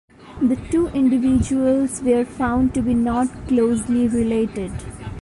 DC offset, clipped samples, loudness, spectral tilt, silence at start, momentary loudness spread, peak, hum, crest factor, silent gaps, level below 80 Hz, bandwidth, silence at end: under 0.1%; under 0.1%; -19 LUFS; -6.5 dB/octave; 0.2 s; 5 LU; -6 dBFS; none; 12 dB; none; -38 dBFS; 11.5 kHz; 0 s